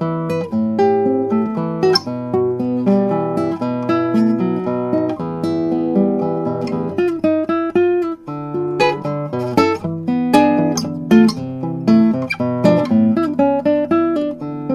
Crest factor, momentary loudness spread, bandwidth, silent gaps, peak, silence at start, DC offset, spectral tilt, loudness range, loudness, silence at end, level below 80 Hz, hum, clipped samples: 16 dB; 8 LU; 13.5 kHz; none; 0 dBFS; 0 s; under 0.1%; -7 dB/octave; 3 LU; -17 LUFS; 0 s; -56 dBFS; none; under 0.1%